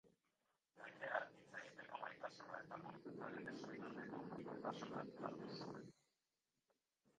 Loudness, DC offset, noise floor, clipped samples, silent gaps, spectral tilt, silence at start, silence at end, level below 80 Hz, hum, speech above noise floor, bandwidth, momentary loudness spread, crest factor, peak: -52 LUFS; under 0.1%; under -90 dBFS; under 0.1%; none; -5.5 dB/octave; 0.05 s; 1.3 s; -88 dBFS; none; over 39 dB; 9.6 kHz; 9 LU; 26 dB; -28 dBFS